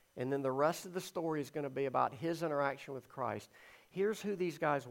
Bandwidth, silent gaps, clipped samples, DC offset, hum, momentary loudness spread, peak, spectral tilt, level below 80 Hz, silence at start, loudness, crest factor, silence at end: 16.5 kHz; none; under 0.1%; under 0.1%; none; 10 LU; -18 dBFS; -5.5 dB/octave; -80 dBFS; 0.15 s; -37 LUFS; 20 dB; 0 s